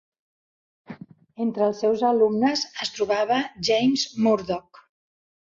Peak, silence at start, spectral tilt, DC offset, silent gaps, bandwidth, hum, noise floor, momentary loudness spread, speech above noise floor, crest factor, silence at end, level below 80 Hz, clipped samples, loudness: -8 dBFS; 0.9 s; -4 dB/octave; under 0.1%; none; 7.6 kHz; none; -43 dBFS; 11 LU; 20 dB; 16 dB; 0.95 s; -64 dBFS; under 0.1%; -23 LUFS